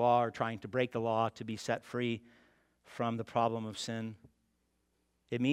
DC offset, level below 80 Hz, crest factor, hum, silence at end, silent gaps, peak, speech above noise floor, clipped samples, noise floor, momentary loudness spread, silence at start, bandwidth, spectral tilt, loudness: under 0.1%; -74 dBFS; 20 dB; none; 0 s; none; -16 dBFS; 43 dB; under 0.1%; -78 dBFS; 9 LU; 0 s; 13.5 kHz; -6 dB/octave; -35 LUFS